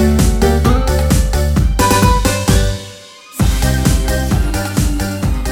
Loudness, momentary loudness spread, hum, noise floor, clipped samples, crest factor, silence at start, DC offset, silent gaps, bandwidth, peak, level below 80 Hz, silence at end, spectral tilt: -14 LUFS; 7 LU; none; -35 dBFS; under 0.1%; 12 dB; 0 s; under 0.1%; none; 17.5 kHz; 0 dBFS; -16 dBFS; 0 s; -5 dB/octave